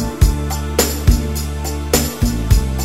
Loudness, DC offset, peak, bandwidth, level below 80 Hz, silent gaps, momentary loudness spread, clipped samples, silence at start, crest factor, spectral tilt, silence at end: -18 LUFS; 0.8%; 0 dBFS; 16.5 kHz; -18 dBFS; none; 7 LU; under 0.1%; 0 s; 16 dB; -5 dB/octave; 0 s